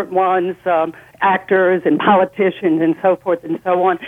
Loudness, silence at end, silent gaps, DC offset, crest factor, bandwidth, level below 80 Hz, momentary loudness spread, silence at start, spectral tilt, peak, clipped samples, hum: -16 LUFS; 0 s; none; under 0.1%; 14 dB; 3.9 kHz; -60 dBFS; 5 LU; 0 s; -8 dB/octave; -2 dBFS; under 0.1%; none